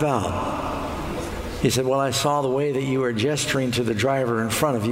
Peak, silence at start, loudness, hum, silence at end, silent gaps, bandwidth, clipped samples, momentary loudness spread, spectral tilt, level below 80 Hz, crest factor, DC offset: -6 dBFS; 0 s; -23 LUFS; none; 0 s; none; 16 kHz; under 0.1%; 8 LU; -5 dB/octave; -42 dBFS; 16 dB; under 0.1%